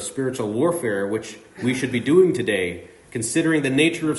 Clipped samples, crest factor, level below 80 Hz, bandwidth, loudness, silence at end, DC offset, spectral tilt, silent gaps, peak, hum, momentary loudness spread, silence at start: under 0.1%; 16 dB; -60 dBFS; 11.5 kHz; -21 LUFS; 0 s; under 0.1%; -5 dB/octave; none; -6 dBFS; none; 12 LU; 0 s